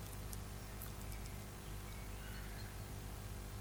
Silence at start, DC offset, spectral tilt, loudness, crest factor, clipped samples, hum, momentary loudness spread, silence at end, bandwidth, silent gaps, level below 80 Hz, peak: 0 s; under 0.1%; -4.5 dB/octave; -49 LUFS; 20 dB; under 0.1%; 50 Hz at -50 dBFS; 2 LU; 0 s; over 20 kHz; none; -52 dBFS; -28 dBFS